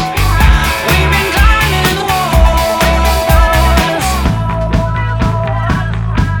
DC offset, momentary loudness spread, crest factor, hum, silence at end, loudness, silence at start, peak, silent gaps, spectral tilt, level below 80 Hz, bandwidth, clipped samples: under 0.1%; 5 LU; 10 dB; none; 0 s; -12 LUFS; 0 s; 0 dBFS; none; -5 dB/octave; -14 dBFS; 19.5 kHz; 0.2%